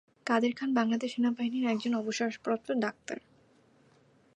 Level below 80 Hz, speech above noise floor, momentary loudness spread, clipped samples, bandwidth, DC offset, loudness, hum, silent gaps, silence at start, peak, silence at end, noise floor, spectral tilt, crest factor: -80 dBFS; 34 dB; 6 LU; under 0.1%; 8.8 kHz; under 0.1%; -31 LUFS; none; none; 0.25 s; -12 dBFS; 1.15 s; -64 dBFS; -4.5 dB/octave; 20 dB